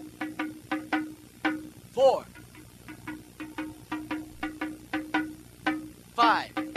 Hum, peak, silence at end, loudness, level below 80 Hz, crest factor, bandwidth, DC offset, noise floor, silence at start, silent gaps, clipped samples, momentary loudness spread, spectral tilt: 60 Hz at -55 dBFS; -8 dBFS; 0 s; -30 LUFS; -60 dBFS; 22 dB; 14 kHz; under 0.1%; -49 dBFS; 0 s; none; under 0.1%; 18 LU; -4.5 dB/octave